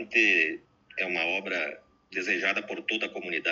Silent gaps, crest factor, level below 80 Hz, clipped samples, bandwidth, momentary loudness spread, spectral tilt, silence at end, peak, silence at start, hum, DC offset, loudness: none; 20 dB; -76 dBFS; under 0.1%; 7.6 kHz; 13 LU; 0 dB/octave; 0 s; -10 dBFS; 0 s; none; under 0.1%; -27 LUFS